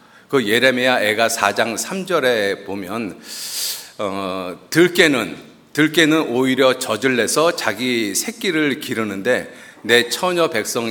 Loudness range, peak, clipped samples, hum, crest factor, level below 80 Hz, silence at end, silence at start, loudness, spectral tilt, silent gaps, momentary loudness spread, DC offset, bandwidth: 4 LU; 0 dBFS; under 0.1%; none; 18 dB; -64 dBFS; 0 s; 0.3 s; -18 LUFS; -3 dB/octave; none; 12 LU; under 0.1%; over 20 kHz